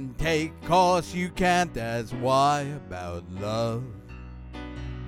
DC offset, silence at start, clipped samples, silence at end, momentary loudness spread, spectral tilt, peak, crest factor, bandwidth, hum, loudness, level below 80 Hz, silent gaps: under 0.1%; 0 s; under 0.1%; 0 s; 18 LU; -5 dB/octave; -10 dBFS; 18 dB; 16.5 kHz; none; -26 LUFS; -44 dBFS; none